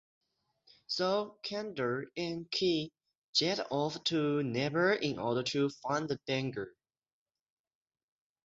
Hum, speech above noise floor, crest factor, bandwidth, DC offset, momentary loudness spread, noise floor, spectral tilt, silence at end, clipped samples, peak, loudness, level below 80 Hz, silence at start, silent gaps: none; 36 dB; 20 dB; 7.8 kHz; under 0.1%; 8 LU; -69 dBFS; -5 dB/octave; 1.75 s; under 0.1%; -16 dBFS; -33 LUFS; -72 dBFS; 0.9 s; 3.18-3.33 s